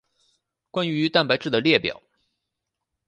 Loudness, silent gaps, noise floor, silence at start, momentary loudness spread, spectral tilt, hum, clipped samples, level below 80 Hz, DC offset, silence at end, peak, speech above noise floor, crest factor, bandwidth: -22 LUFS; none; -82 dBFS; 0.75 s; 11 LU; -6 dB/octave; none; under 0.1%; -64 dBFS; under 0.1%; 1.15 s; -4 dBFS; 61 dB; 22 dB; 9 kHz